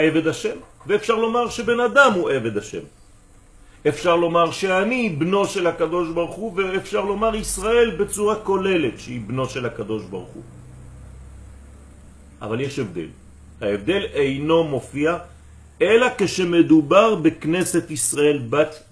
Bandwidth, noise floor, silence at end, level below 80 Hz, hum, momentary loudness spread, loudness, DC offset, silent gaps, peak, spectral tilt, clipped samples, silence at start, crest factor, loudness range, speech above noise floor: 11 kHz; -49 dBFS; 0.15 s; -46 dBFS; none; 13 LU; -20 LUFS; under 0.1%; none; -2 dBFS; -4.5 dB/octave; under 0.1%; 0 s; 20 dB; 13 LU; 29 dB